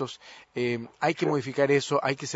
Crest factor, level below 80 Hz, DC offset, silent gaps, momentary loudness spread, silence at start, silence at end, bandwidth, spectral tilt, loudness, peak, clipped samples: 18 dB; -72 dBFS; under 0.1%; none; 12 LU; 0 s; 0 s; 8 kHz; -5 dB/octave; -27 LUFS; -8 dBFS; under 0.1%